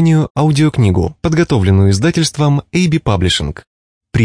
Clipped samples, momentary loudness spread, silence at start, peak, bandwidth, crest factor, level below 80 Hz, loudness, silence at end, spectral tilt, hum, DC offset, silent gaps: under 0.1%; 5 LU; 0 s; -2 dBFS; 10.5 kHz; 10 dB; -34 dBFS; -13 LUFS; 0 s; -6 dB/octave; none; under 0.1%; 0.30-0.35 s, 3.67-4.01 s